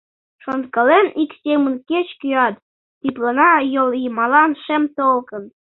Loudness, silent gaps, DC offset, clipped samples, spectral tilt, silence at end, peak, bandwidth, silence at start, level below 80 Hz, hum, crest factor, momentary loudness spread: -17 LUFS; 2.62-3.01 s; under 0.1%; under 0.1%; -7.5 dB/octave; 0.3 s; -2 dBFS; 4.1 kHz; 0.45 s; -66 dBFS; none; 16 dB; 13 LU